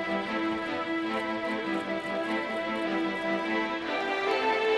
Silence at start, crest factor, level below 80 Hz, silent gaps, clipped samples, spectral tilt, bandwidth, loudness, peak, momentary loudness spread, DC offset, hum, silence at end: 0 s; 14 dB; -64 dBFS; none; under 0.1%; -5 dB/octave; 12 kHz; -30 LUFS; -16 dBFS; 4 LU; under 0.1%; none; 0 s